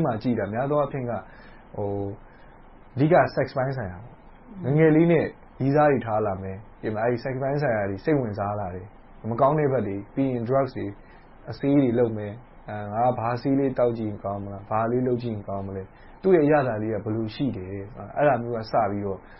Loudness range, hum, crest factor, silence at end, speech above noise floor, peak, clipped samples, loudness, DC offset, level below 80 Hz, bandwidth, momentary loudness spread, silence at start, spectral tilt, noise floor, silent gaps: 4 LU; none; 18 dB; 0 s; 24 dB; -8 dBFS; under 0.1%; -25 LUFS; under 0.1%; -50 dBFS; 5.8 kHz; 16 LU; 0 s; -12 dB/octave; -48 dBFS; none